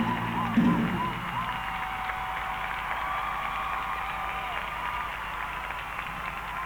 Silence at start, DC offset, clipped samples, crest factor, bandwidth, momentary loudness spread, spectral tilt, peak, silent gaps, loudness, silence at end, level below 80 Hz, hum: 0 s; under 0.1%; under 0.1%; 18 dB; over 20 kHz; 8 LU; -5.5 dB/octave; -12 dBFS; none; -30 LUFS; 0 s; -46 dBFS; none